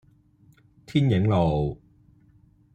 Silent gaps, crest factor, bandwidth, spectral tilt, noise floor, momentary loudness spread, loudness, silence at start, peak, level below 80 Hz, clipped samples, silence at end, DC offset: none; 18 dB; 9 kHz; -8.5 dB/octave; -58 dBFS; 10 LU; -24 LUFS; 0.9 s; -10 dBFS; -46 dBFS; under 0.1%; 1 s; under 0.1%